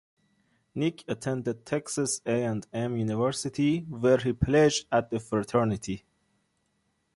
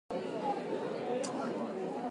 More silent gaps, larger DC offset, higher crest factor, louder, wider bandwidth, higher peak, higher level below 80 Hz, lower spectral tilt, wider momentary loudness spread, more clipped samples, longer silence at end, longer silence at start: neither; neither; about the same, 18 dB vs 14 dB; first, -28 LUFS vs -37 LUFS; about the same, 11.5 kHz vs 11.5 kHz; first, -10 dBFS vs -22 dBFS; first, -52 dBFS vs -78 dBFS; about the same, -5.5 dB/octave vs -5 dB/octave; first, 9 LU vs 2 LU; neither; first, 1.2 s vs 0 s; first, 0.75 s vs 0.1 s